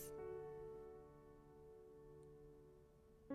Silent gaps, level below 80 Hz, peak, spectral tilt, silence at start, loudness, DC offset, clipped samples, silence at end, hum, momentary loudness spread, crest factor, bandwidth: none; -72 dBFS; -38 dBFS; -6 dB/octave; 0 s; -58 LUFS; under 0.1%; under 0.1%; 0 s; none; 15 LU; 18 dB; 13.5 kHz